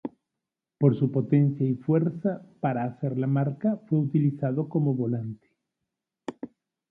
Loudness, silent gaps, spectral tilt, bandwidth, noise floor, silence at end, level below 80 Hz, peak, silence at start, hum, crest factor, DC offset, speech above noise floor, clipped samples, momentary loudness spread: -26 LUFS; none; -11.5 dB/octave; 3.7 kHz; -87 dBFS; 0.45 s; -70 dBFS; -8 dBFS; 0.05 s; none; 20 dB; under 0.1%; 62 dB; under 0.1%; 17 LU